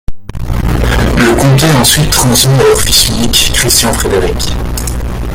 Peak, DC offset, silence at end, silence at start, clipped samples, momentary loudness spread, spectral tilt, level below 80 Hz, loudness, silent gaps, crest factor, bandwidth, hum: 0 dBFS; under 0.1%; 0 s; 0.1 s; 0.3%; 11 LU; -3.5 dB/octave; -18 dBFS; -9 LUFS; none; 10 dB; over 20 kHz; none